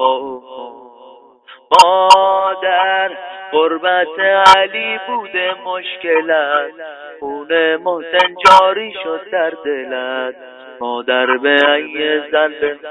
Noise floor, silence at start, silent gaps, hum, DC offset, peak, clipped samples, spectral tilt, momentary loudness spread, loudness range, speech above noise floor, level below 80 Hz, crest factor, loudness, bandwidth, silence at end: -43 dBFS; 0 s; none; none; under 0.1%; 0 dBFS; 0.8%; -2 dB/octave; 18 LU; 5 LU; 28 dB; -56 dBFS; 14 dB; -14 LUFS; 11 kHz; 0 s